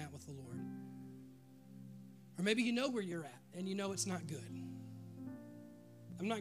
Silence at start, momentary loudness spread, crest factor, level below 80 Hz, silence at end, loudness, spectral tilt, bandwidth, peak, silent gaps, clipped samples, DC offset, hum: 0 s; 21 LU; 24 dB; -84 dBFS; 0 s; -42 LUFS; -4.5 dB/octave; 15.5 kHz; -20 dBFS; none; under 0.1%; under 0.1%; none